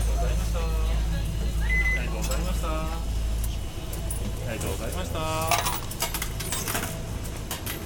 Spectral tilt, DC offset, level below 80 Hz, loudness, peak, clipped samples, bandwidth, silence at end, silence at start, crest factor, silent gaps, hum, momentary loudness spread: -4 dB/octave; under 0.1%; -30 dBFS; -29 LUFS; -8 dBFS; under 0.1%; 18.5 kHz; 0 s; 0 s; 18 dB; none; none; 8 LU